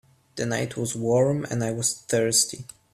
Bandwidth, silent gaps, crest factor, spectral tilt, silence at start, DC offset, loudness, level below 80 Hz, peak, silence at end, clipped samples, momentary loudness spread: 15.5 kHz; none; 18 dB; -3.5 dB/octave; 0.35 s; under 0.1%; -24 LUFS; -62 dBFS; -6 dBFS; 0.3 s; under 0.1%; 9 LU